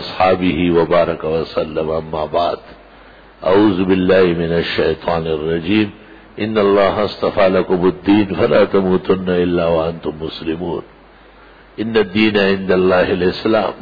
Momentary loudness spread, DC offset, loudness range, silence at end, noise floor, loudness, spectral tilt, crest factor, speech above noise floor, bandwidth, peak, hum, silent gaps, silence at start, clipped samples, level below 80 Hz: 9 LU; under 0.1%; 4 LU; 0 s; -43 dBFS; -16 LUFS; -8.5 dB/octave; 14 dB; 28 dB; 5 kHz; -2 dBFS; none; none; 0 s; under 0.1%; -42 dBFS